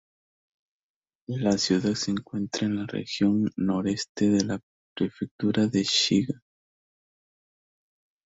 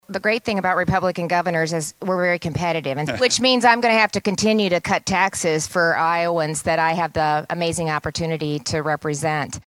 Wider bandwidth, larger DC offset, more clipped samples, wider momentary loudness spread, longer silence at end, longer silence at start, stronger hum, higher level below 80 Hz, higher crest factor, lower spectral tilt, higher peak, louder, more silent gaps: second, 8 kHz vs 16.5 kHz; neither; neither; about the same, 9 LU vs 8 LU; first, 1.95 s vs 0.05 s; first, 1.3 s vs 0.1 s; neither; second, -60 dBFS vs -50 dBFS; about the same, 20 dB vs 20 dB; about the same, -5 dB/octave vs -4 dB/octave; second, -8 dBFS vs -2 dBFS; second, -26 LUFS vs -20 LUFS; first, 4.09-4.15 s, 4.63-4.96 s, 5.31-5.39 s vs none